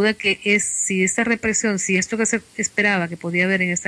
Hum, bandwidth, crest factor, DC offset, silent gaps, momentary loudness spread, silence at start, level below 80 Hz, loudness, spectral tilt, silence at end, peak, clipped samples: none; 11 kHz; 14 dB; under 0.1%; none; 4 LU; 0 s; -56 dBFS; -19 LUFS; -3 dB/octave; 0 s; -6 dBFS; under 0.1%